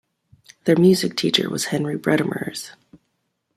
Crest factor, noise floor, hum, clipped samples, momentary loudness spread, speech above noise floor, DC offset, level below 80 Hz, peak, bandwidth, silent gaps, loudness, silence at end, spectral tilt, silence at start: 20 dB; -73 dBFS; none; under 0.1%; 14 LU; 53 dB; under 0.1%; -62 dBFS; -2 dBFS; 15 kHz; none; -20 LUFS; 0.85 s; -5 dB/octave; 0.65 s